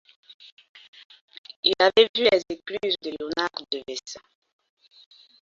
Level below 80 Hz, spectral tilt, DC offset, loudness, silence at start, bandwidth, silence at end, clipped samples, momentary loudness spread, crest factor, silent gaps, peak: -66 dBFS; -2.5 dB/octave; under 0.1%; -23 LUFS; 1.65 s; 7.6 kHz; 1.25 s; under 0.1%; 23 LU; 24 dB; 2.09-2.14 s; -4 dBFS